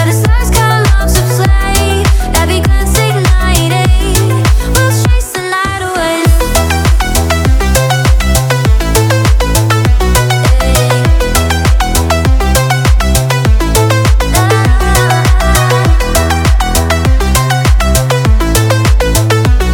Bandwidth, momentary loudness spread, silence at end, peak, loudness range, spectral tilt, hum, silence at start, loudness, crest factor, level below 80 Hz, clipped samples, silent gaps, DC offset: 19 kHz; 2 LU; 0 s; 0 dBFS; 1 LU; -4.5 dB/octave; none; 0 s; -10 LUFS; 8 dB; -12 dBFS; under 0.1%; none; under 0.1%